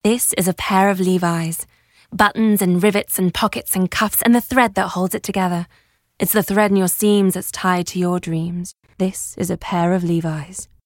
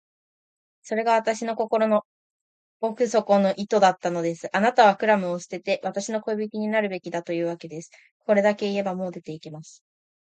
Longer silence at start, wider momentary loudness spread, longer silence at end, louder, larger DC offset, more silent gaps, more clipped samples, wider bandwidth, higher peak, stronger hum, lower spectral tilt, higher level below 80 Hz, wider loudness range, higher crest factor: second, 0.05 s vs 0.85 s; second, 10 LU vs 15 LU; second, 0.2 s vs 0.55 s; first, -18 LUFS vs -24 LUFS; neither; second, none vs 2.05-2.80 s, 8.11-8.20 s; neither; first, 17 kHz vs 9.2 kHz; first, 0 dBFS vs -4 dBFS; neither; about the same, -4.5 dB/octave vs -5 dB/octave; first, -48 dBFS vs -76 dBFS; about the same, 3 LU vs 5 LU; about the same, 18 dB vs 20 dB